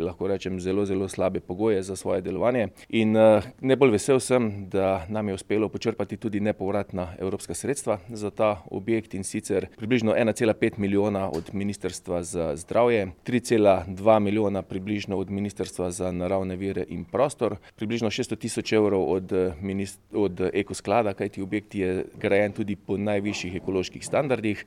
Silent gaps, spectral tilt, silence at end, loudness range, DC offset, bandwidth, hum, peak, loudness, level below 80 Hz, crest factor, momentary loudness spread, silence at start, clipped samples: none; -6 dB/octave; 0.05 s; 6 LU; under 0.1%; 14.5 kHz; none; -4 dBFS; -26 LUFS; -56 dBFS; 20 dB; 10 LU; 0 s; under 0.1%